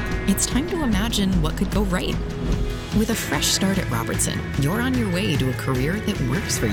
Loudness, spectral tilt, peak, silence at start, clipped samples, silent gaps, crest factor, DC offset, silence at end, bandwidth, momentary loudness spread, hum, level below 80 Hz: -22 LUFS; -4.5 dB/octave; -8 dBFS; 0 s; under 0.1%; none; 14 dB; under 0.1%; 0 s; 18 kHz; 4 LU; none; -30 dBFS